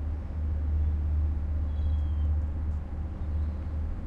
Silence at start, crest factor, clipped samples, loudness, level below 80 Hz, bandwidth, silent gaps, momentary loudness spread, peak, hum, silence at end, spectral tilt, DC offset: 0 s; 10 dB; under 0.1%; -31 LUFS; -30 dBFS; 3.5 kHz; none; 5 LU; -18 dBFS; none; 0 s; -10 dB/octave; under 0.1%